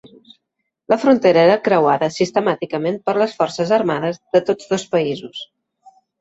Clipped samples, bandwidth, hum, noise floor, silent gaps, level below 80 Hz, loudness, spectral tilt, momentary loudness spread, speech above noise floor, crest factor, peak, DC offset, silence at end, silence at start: under 0.1%; 8 kHz; none; -76 dBFS; none; -62 dBFS; -17 LUFS; -5.5 dB/octave; 10 LU; 59 dB; 16 dB; -2 dBFS; under 0.1%; 0.75 s; 0.05 s